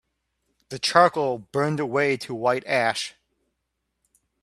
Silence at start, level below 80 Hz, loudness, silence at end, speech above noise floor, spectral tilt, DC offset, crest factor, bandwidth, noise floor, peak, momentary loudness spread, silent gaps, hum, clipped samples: 0.7 s; -68 dBFS; -23 LUFS; 1.35 s; 56 dB; -4.5 dB/octave; under 0.1%; 24 dB; 13.5 kHz; -78 dBFS; -2 dBFS; 10 LU; none; none; under 0.1%